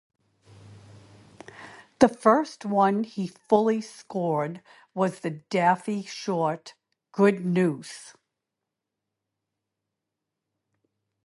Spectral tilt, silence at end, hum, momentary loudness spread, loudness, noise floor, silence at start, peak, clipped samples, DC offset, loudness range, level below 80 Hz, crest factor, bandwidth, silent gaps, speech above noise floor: -6.5 dB/octave; 3.15 s; none; 19 LU; -25 LUFS; -85 dBFS; 0.7 s; -2 dBFS; under 0.1%; under 0.1%; 5 LU; -68 dBFS; 26 dB; 11.5 kHz; none; 61 dB